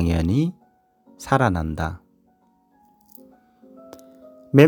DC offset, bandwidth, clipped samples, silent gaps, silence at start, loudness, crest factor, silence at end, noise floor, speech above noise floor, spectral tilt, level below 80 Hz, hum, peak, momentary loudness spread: under 0.1%; over 20 kHz; under 0.1%; none; 0 s; -22 LUFS; 22 dB; 0 s; -61 dBFS; 40 dB; -7.5 dB/octave; -40 dBFS; none; 0 dBFS; 25 LU